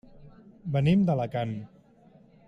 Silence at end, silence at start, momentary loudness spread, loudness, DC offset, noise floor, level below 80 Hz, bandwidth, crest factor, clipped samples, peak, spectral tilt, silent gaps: 0.8 s; 0.2 s; 16 LU; -27 LUFS; under 0.1%; -57 dBFS; -58 dBFS; 7.6 kHz; 16 dB; under 0.1%; -14 dBFS; -9 dB/octave; none